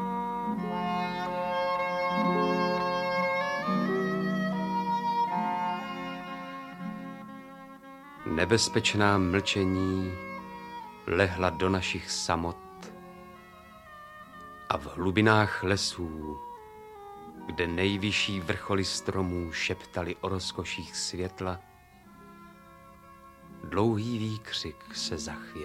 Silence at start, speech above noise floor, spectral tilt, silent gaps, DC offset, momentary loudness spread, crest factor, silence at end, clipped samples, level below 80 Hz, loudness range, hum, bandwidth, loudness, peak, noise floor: 0 s; 25 dB; -4.5 dB/octave; none; under 0.1%; 21 LU; 24 dB; 0 s; under 0.1%; -56 dBFS; 7 LU; none; 16 kHz; -29 LUFS; -6 dBFS; -54 dBFS